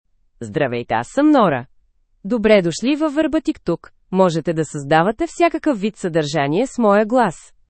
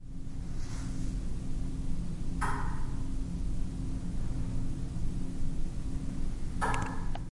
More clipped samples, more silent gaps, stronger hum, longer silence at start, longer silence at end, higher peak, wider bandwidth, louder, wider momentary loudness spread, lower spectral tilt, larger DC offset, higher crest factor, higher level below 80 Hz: neither; neither; neither; first, 0.4 s vs 0 s; first, 0.3 s vs 0.1 s; first, 0 dBFS vs -16 dBFS; second, 8.8 kHz vs 11.5 kHz; first, -18 LUFS vs -38 LUFS; first, 10 LU vs 5 LU; about the same, -6 dB/octave vs -6.5 dB/octave; neither; about the same, 18 dB vs 16 dB; second, -50 dBFS vs -34 dBFS